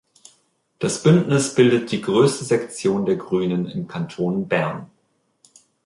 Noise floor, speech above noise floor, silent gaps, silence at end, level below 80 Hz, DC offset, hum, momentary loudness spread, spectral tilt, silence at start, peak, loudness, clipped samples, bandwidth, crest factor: -67 dBFS; 47 dB; none; 1 s; -60 dBFS; under 0.1%; none; 11 LU; -6 dB/octave; 0.8 s; -2 dBFS; -20 LUFS; under 0.1%; 11.5 kHz; 18 dB